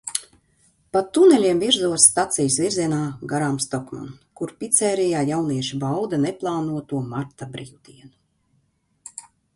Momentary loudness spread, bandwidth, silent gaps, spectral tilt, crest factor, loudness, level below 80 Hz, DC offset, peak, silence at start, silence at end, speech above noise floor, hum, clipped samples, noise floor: 21 LU; 11.5 kHz; none; -3.5 dB/octave; 22 dB; -20 LUFS; -60 dBFS; under 0.1%; 0 dBFS; 0.05 s; 0.35 s; 45 dB; none; under 0.1%; -67 dBFS